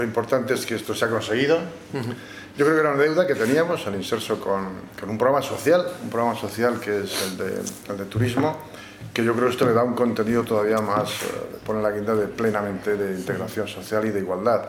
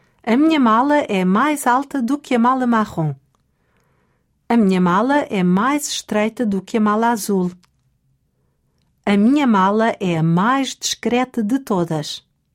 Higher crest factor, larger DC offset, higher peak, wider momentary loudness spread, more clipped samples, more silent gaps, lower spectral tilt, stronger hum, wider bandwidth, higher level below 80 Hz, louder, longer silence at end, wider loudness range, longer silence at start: about the same, 18 dB vs 14 dB; neither; about the same, -4 dBFS vs -4 dBFS; first, 11 LU vs 8 LU; neither; neither; about the same, -5.5 dB/octave vs -5.5 dB/octave; neither; about the same, 17.5 kHz vs 16.5 kHz; about the same, -58 dBFS vs -58 dBFS; second, -23 LUFS vs -17 LUFS; second, 0 s vs 0.35 s; about the same, 3 LU vs 3 LU; second, 0 s vs 0.25 s